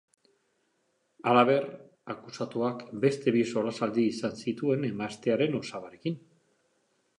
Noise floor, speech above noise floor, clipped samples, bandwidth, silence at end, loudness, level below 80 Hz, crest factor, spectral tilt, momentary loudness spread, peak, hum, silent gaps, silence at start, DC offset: -74 dBFS; 46 dB; under 0.1%; 10.5 kHz; 1 s; -29 LUFS; -74 dBFS; 22 dB; -6.5 dB/octave; 16 LU; -8 dBFS; none; none; 1.2 s; under 0.1%